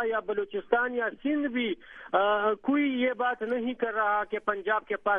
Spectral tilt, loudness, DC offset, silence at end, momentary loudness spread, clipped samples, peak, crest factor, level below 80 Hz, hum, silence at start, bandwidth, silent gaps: -7 dB/octave; -28 LUFS; under 0.1%; 0 s; 5 LU; under 0.1%; -10 dBFS; 18 dB; -66 dBFS; none; 0 s; 3.7 kHz; none